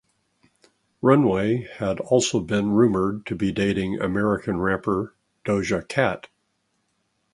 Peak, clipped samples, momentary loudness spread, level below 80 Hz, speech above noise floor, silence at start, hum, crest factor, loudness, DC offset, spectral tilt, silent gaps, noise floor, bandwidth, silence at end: -2 dBFS; under 0.1%; 8 LU; -50 dBFS; 50 dB; 1.05 s; none; 22 dB; -23 LUFS; under 0.1%; -6 dB/octave; none; -72 dBFS; 11.5 kHz; 1.15 s